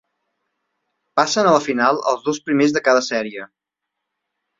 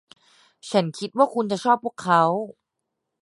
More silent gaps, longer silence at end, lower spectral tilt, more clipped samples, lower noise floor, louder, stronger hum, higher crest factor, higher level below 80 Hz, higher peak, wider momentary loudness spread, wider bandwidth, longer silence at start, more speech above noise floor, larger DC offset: neither; first, 1.15 s vs 0.7 s; second, -4 dB/octave vs -5.5 dB/octave; neither; about the same, -81 dBFS vs -81 dBFS; first, -18 LUFS vs -22 LUFS; first, 50 Hz at -55 dBFS vs none; about the same, 20 dB vs 20 dB; first, -66 dBFS vs -74 dBFS; about the same, -2 dBFS vs -4 dBFS; about the same, 9 LU vs 10 LU; second, 7.8 kHz vs 11.5 kHz; first, 1.15 s vs 0.65 s; first, 63 dB vs 59 dB; neither